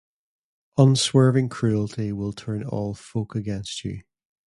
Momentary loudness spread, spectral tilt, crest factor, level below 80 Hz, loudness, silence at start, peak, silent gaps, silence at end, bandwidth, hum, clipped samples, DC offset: 13 LU; -6 dB/octave; 20 dB; -52 dBFS; -23 LUFS; 0.75 s; -4 dBFS; none; 0.5 s; 11.5 kHz; none; under 0.1%; under 0.1%